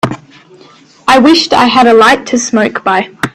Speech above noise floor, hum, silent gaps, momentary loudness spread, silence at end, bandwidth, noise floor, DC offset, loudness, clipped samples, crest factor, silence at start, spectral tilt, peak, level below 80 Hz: 33 dB; none; none; 11 LU; 0.05 s; 14 kHz; -40 dBFS; under 0.1%; -8 LUFS; 0.2%; 10 dB; 0.05 s; -3.5 dB/octave; 0 dBFS; -46 dBFS